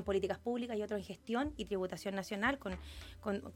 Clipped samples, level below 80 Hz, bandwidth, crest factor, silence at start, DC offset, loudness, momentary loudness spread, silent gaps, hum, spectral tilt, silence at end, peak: under 0.1%; -56 dBFS; 16.5 kHz; 20 dB; 0 s; under 0.1%; -39 LUFS; 9 LU; none; none; -5.5 dB/octave; 0 s; -20 dBFS